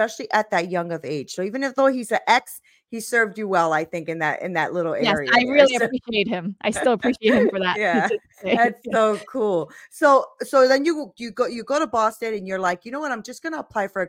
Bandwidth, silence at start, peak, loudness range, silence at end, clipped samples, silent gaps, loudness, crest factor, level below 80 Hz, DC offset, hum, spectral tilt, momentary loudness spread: 16.5 kHz; 0 s; 0 dBFS; 3 LU; 0 s; under 0.1%; none; -21 LUFS; 20 dB; -62 dBFS; under 0.1%; none; -4.5 dB/octave; 11 LU